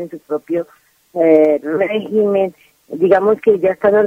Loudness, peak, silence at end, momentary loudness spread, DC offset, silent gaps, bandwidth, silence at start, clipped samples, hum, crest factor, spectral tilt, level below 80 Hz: -15 LUFS; 0 dBFS; 0 s; 13 LU; under 0.1%; none; 5.8 kHz; 0 s; under 0.1%; none; 14 dB; -8 dB/octave; -58 dBFS